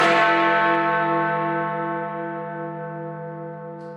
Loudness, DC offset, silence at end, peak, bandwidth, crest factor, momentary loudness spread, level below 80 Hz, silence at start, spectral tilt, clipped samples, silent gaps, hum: -22 LUFS; under 0.1%; 0 s; -6 dBFS; 10.5 kHz; 18 dB; 16 LU; -74 dBFS; 0 s; -5.5 dB/octave; under 0.1%; none; none